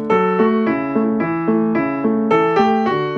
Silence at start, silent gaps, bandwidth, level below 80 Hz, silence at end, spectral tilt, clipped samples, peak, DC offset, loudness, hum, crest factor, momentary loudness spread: 0 s; none; 6.6 kHz; -56 dBFS; 0 s; -8 dB/octave; under 0.1%; -4 dBFS; under 0.1%; -17 LUFS; none; 12 dB; 4 LU